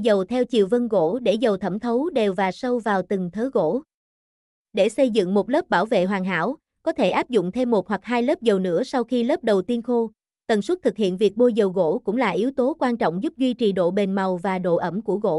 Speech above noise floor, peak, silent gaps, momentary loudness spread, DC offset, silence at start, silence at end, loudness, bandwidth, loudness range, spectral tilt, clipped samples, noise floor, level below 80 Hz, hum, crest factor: over 69 dB; -8 dBFS; 3.94-4.65 s; 5 LU; under 0.1%; 0 s; 0 s; -22 LUFS; 12 kHz; 2 LU; -6.5 dB/octave; under 0.1%; under -90 dBFS; -62 dBFS; none; 14 dB